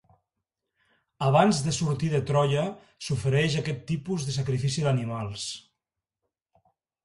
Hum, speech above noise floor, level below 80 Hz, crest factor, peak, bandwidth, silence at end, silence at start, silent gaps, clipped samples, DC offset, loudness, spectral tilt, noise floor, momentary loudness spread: none; 61 dB; -56 dBFS; 22 dB; -6 dBFS; 11.5 kHz; 1.45 s; 1.2 s; none; under 0.1%; under 0.1%; -26 LUFS; -5.5 dB/octave; -87 dBFS; 11 LU